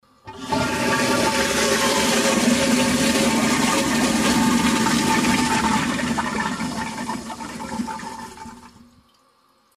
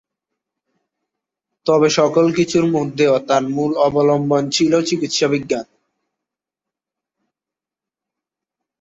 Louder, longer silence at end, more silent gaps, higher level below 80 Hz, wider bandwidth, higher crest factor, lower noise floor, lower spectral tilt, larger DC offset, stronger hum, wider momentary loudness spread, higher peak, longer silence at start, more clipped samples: second, -20 LUFS vs -16 LUFS; second, 1.1 s vs 3.15 s; neither; first, -44 dBFS vs -58 dBFS; first, 15.5 kHz vs 8.2 kHz; about the same, 14 dB vs 18 dB; second, -60 dBFS vs -88 dBFS; second, -3 dB/octave vs -5 dB/octave; neither; neither; first, 13 LU vs 5 LU; second, -6 dBFS vs -2 dBFS; second, 0.25 s vs 1.65 s; neither